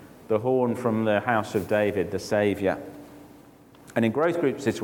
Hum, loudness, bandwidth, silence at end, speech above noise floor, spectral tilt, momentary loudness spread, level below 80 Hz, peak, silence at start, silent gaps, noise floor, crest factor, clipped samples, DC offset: none; -25 LUFS; 19 kHz; 0 s; 27 dB; -6.5 dB/octave; 6 LU; -62 dBFS; -8 dBFS; 0 s; none; -51 dBFS; 18 dB; under 0.1%; under 0.1%